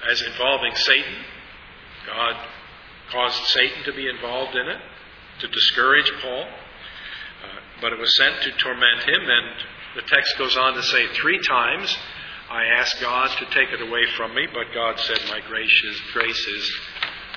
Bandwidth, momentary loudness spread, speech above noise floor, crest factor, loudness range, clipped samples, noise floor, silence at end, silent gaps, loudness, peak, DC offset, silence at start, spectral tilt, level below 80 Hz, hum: 5.4 kHz; 18 LU; 21 dB; 22 dB; 5 LU; under 0.1%; -43 dBFS; 0 s; none; -20 LUFS; 0 dBFS; under 0.1%; 0 s; -1.5 dB/octave; -54 dBFS; none